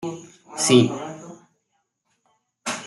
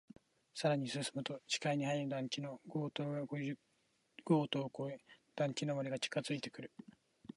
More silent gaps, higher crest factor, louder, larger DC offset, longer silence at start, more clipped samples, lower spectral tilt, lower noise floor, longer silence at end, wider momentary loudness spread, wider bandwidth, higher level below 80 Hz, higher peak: neither; about the same, 22 dB vs 20 dB; first, -20 LUFS vs -40 LUFS; neither; second, 0 s vs 0.55 s; neither; about the same, -4 dB/octave vs -5 dB/octave; second, -73 dBFS vs -78 dBFS; second, 0 s vs 0.7 s; first, 23 LU vs 16 LU; about the same, 12 kHz vs 11.5 kHz; first, -66 dBFS vs -84 dBFS; first, -2 dBFS vs -22 dBFS